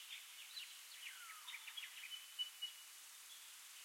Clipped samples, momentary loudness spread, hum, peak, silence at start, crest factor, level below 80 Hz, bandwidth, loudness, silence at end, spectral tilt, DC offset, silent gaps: under 0.1%; 9 LU; none; -34 dBFS; 0 s; 20 dB; under -90 dBFS; 16.5 kHz; -51 LUFS; 0 s; 6.5 dB/octave; under 0.1%; none